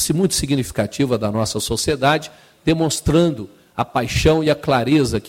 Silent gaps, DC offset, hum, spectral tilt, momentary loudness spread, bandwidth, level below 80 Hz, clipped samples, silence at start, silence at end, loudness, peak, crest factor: none; under 0.1%; none; -5 dB/octave; 7 LU; 16.5 kHz; -36 dBFS; under 0.1%; 0 s; 0 s; -18 LUFS; -4 dBFS; 14 dB